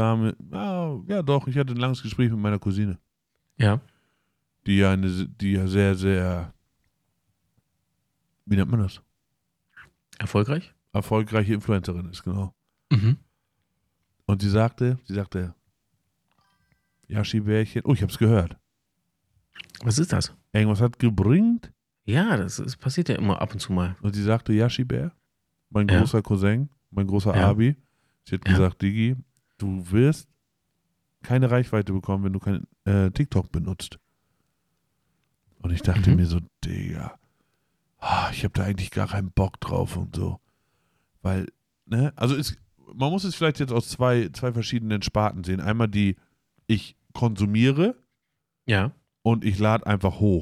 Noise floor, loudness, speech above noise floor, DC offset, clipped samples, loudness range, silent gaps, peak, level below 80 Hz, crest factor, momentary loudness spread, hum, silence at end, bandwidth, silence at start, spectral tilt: -80 dBFS; -24 LUFS; 58 dB; under 0.1%; under 0.1%; 5 LU; none; -6 dBFS; -46 dBFS; 18 dB; 11 LU; none; 0 s; 13.5 kHz; 0 s; -7 dB/octave